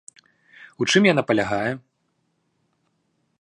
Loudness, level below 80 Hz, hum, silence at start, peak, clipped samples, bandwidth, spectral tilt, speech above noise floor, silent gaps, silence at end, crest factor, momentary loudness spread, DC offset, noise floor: -20 LUFS; -62 dBFS; none; 0.8 s; -2 dBFS; under 0.1%; 11 kHz; -4.5 dB/octave; 51 dB; none; 1.6 s; 22 dB; 11 LU; under 0.1%; -71 dBFS